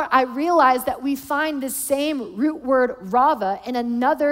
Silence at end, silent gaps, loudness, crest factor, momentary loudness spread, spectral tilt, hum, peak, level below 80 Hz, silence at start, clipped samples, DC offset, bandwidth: 0 s; none; -21 LUFS; 16 dB; 8 LU; -3.5 dB/octave; none; -4 dBFS; -56 dBFS; 0 s; under 0.1%; under 0.1%; 16.5 kHz